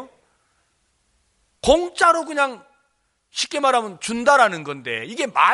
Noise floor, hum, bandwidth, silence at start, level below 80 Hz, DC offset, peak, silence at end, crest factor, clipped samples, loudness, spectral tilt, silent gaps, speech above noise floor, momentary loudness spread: -68 dBFS; none; 11.5 kHz; 0 s; -48 dBFS; under 0.1%; 0 dBFS; 0 s; 20 dB; under 0.1%; -20 LUFS; -2.5 dB/octave; none; 49 dB; 12 LU